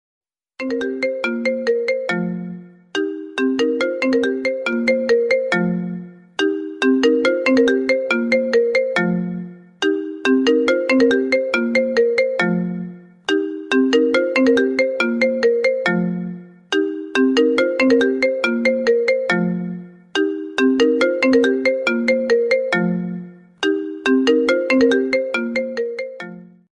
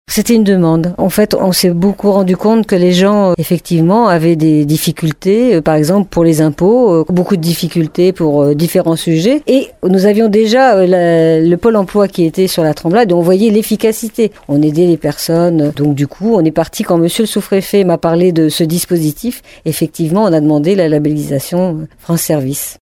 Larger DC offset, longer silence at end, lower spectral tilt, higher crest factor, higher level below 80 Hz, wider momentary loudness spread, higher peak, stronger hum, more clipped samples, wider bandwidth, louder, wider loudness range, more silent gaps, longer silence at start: neither; first, 0.3 s vs 0.1 s; about the same, -5.5 dB/octave vs -6 dB/octave; about the same, 14 dB vs 10 dB; second, -62 dBFS vs -42 dBFS; first, 11 LU vs 6 LU; second, -4 dBFS vs 0 dBFS; neither; neither; second, 10.5 kHz vs 18 kHz; second, -18 LUFS vs -11 LUFS; about the same, 2 LU vs 3 LU; neither; first, 0.6 s vs 0.1 s